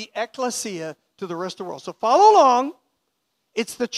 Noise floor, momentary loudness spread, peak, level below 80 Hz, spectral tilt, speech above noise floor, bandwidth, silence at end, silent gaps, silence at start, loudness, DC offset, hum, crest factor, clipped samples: -74 dBFS; 20 LU; -2 dBFS; -74 dBFS; -3 dB/octave; 54 dB; 14.5 kHz; 0 s; none; 0 s; -19 LUFS; under 0.1%; none; 18 dB; under 0.1%